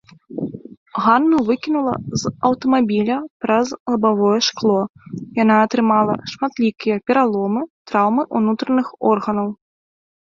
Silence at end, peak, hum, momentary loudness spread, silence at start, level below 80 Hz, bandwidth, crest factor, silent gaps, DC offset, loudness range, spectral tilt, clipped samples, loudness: 0.75 s; -2 dBFS; none; 12 LU; 0.3 s; -56 dBFS; 7.4 kHz; 16 dB; 0.77-0.86 s, 3.30-3.40 s, 3.80-3.86 s, 4.90-4.94 s, 7.70-7.85 s; under 0.1%; 2 LU; -5.5 dB/octave; under 0.1%; -18 LUFS